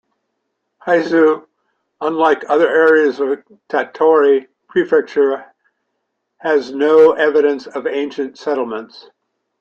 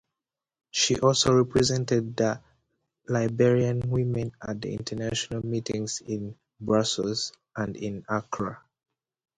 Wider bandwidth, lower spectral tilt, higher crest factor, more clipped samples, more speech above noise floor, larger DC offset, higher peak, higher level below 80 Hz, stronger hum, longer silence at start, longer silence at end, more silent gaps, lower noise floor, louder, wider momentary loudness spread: second, 7 kHz vs 11 kHz; about the same, -5.5 dB/octave vs -4.5 dB/octave; about the same, 16 dB vs 20 dB; neither; second, 58 dB vs 63 dB; neither; first, 0 dBFS vs -6 dBFS; second, -66 dBFS vs -54 dBFS; neither; about the same, 0.85 s vs 0.75 s; second, 0.6 s vs 0.8 s; neither; second, -72 dBFS vs -89 dBFS; first, -15 LUFS vs -27 LUFS; about the same, 13 LU vs 13 LU